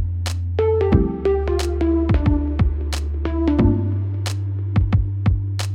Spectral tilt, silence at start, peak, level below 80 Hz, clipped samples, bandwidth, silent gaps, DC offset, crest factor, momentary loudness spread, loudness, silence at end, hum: -7.5 dB/octave; 0 s; -4 dBFS; -26 dBFS; under 0.1%; 12.5 kHz; none; under 0.1%; 16 dB; 7 LU; -20 LUFS; 0 s; none